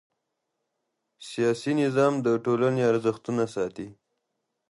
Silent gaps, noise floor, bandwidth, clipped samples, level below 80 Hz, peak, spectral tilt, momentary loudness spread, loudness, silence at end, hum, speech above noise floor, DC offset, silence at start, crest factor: none; -81 dBFS; 11.5 kHz; under 0.1%; -70 dBFS; -10 dBFS; -6.5 dB/octave; 15 LU; -25 LUFS; 0.75 s; none; 56 dB; under 0.1%; 1.2 s; 16 dB